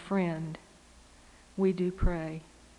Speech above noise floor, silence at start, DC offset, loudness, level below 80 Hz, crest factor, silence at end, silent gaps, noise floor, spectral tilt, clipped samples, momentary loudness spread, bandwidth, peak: 27 dB; 0 s; under 0.1%; -32 LUFS; -40 dBFS; 18 dB; 0.35 s; none; -57 dBFS; -8 dB/octave; under 0.1%; 16 LU; 11 kHz; -16 dBFS